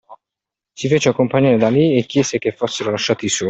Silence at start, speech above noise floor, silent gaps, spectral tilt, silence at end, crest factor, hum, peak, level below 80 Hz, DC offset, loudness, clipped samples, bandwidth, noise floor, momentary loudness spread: 0.1 s; 69 dB; none; -5 dB/octave; 0 s; 14 dB; none; -2 dBFS; -54 dBFS; under 0.1%; -17 LUFS; under 0.1%; 8.4 kHz; -86 dBFS; 7 LU